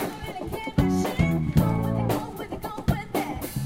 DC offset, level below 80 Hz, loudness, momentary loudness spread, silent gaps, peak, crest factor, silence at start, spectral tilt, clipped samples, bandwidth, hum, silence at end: under 0.1%; -38 dBFS; -26 LUFS; 11 LU; none; -6 dBFS; 20 dB; 0 s; -7 dB/octave; under 0.1%; 16.5 kHz; none; 0 s